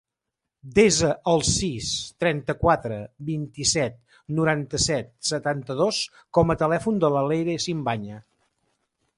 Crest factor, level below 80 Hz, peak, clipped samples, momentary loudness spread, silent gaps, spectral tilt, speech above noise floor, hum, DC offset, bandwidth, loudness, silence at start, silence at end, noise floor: 18 dB; -46 dBFS; -6 dBFS; under 0.1%; 10 LU; none; -4 dB/octave; 61 dB; none; under 0.1%; 11.5 kHz; -24 LUFS; 0.65 s; 1 s; -84 dBFS